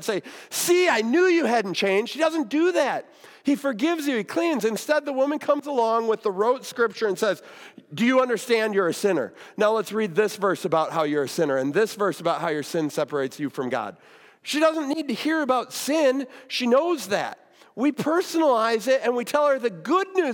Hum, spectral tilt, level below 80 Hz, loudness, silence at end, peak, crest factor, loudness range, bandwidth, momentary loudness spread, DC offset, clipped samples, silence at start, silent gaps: none; -4 dB/octave; -82 dBFS; -23 LUFS; 0 s; -8 dBFS; 16 dB; 3 LU; 18 kHz; 8 LU; under 0.1%; under 0.1%; 0 s; none